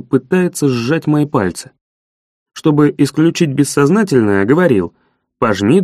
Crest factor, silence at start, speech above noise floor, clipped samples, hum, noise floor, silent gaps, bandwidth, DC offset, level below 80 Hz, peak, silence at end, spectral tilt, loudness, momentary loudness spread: 14 dB; 0.1 s; over 77 dB; under 0.1%; none; under -90 dBFS; 1.81-2.46 s; 14.5 kHz; under 0.1%; -52 dBFS; 0 dBFS; 0 s; -6.5 dB/octave; -14 LUFS; 6 LU